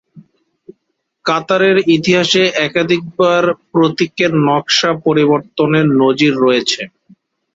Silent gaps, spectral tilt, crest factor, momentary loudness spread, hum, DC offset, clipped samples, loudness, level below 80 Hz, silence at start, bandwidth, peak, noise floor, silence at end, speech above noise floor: none; -5 dB/octave; 14 dB; 5 LU; none; under 0.1%; under 0.1%; -13 LUFS; -56 dBFS; 0.15 s; 8 kHz; 0 dBFS; -70 dBFS; 0.7 s; 57 dB